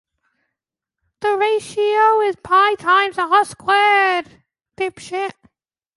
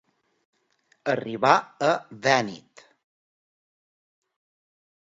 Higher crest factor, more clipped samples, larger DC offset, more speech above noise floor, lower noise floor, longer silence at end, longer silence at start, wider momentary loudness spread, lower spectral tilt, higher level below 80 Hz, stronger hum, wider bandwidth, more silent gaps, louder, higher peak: second, 16 dB vs 26 dB; neither; neither; first, 68 dB vs 43 dB; first, -85 dBFS vs -67 dBFS; second, 0.65 s vs 2.45 s; first, 1.2 s vs 1.05 s; about the same, 12 LU vs 13 LU; second, -2.5 dB/octave vs -4 dB/octave; first, -62 dBFS vs -72 dBFS; neither; first, 11.5 kHz vs 7.8 kHz; neither; first, -17 LUFS vs -24 LUFS; about the same, -2 dBFS vs -2 dBFS